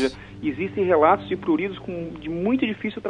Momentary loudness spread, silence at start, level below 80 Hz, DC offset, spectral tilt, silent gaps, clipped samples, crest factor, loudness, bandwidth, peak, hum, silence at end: 13 LU; 0 s; -52 dBFS; under 0.1%; -7 dB/octave; none; under 0.1%; 18 dB; -23 LUFS; 10.5 kHz; -4 dBFS; none; 0 s